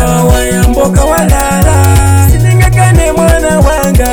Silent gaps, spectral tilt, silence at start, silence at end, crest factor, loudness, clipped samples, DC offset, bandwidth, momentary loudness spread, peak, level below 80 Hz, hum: none; -5.5 dB/octave; 0 s; 0 s; 6 dB; -8 LUFS; 0.3%; under 0.1%; over 20 kHz; 2 LU; 0 dBFS; -12 dBFS; none